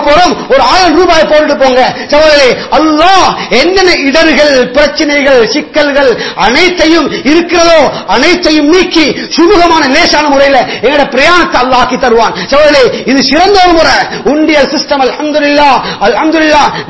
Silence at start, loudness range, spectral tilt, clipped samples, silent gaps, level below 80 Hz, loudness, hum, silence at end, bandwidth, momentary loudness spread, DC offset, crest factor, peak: 0 s; 1 LU; -3.5 dB/octave; 3%; none; -30 dBFS; -6 LUFS; none; 0 s; 8 kHz; 4 LU; 3%; 6 dB; 0 dBFS